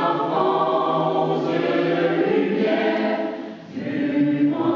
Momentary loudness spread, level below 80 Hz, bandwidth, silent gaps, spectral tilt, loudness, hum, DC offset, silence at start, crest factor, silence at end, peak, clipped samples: 8 LU; -70 dBFS; 6.8 kHz; none; -8 dB/octave; -21 LUFS; none; under 0.1%; 0 s; 14 dB; 0 s; -8 dBFS; under 0.1%